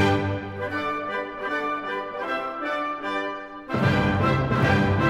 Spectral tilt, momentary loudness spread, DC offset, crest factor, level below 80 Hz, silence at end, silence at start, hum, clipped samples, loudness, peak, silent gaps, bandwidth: -7 dB/octave; 9 LU; under 0.1%; 16 dB; -46 dBFS; 0 s; 0 s; none; under 0.1%; -25 LUFS; -8 dBFS; none; 12.5 kHz